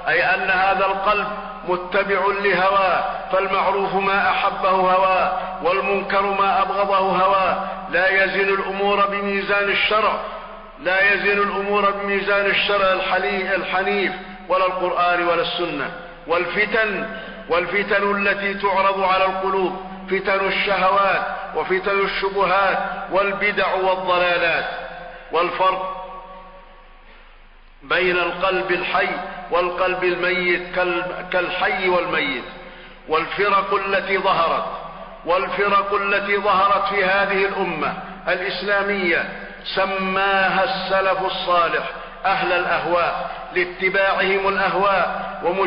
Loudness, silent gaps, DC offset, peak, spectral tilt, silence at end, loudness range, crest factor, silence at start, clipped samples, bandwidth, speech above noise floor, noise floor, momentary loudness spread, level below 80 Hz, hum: -19 LUFS; none; under 0.1%; -8 dBFS; -8.5 dB/octave; 0 s; 3 LU; 12 dB; 0 s; under 0.1%; 5.4 kHz; 26 dB; -45 dBFS; 8 LU; -46 dBFS; none